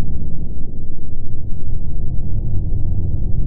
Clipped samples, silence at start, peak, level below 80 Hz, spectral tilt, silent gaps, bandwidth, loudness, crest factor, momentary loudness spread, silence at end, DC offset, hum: under 0.1%; 0 s; -4 dBFS; -20 dBFS; -15 dB/octave; none; 0.8 kHz; -26 LUFS; 8 dB; 8 LU; 0 s; under 0.1%; none